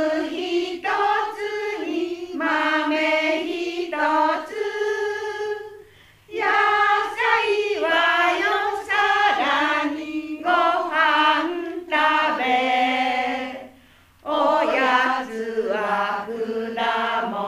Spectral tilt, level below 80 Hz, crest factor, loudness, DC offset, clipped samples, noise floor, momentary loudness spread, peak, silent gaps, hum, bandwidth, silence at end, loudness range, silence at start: -3 dB/octave; -64 dBFS; 16 dB; -21 LUFS; under 0.1%; under 0.1%; -53 dBFS; 9 LU; -4 dBFS; none; none; 15.5 kHz; 0 s; 3 LU; 0 s